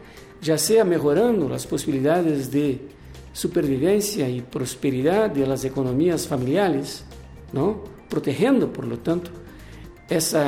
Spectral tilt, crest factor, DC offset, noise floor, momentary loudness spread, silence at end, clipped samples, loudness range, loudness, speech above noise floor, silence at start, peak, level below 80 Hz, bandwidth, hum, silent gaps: -5.5 dB/octave; 14 dB; under 0.1%; -41 dBFS; 16 LU; 0 s; under 0.1%; 3 LU; -22 LUFS; 20 dB; 0 s; -8 dBFS; -48 dBFS; 17 kHz; none; none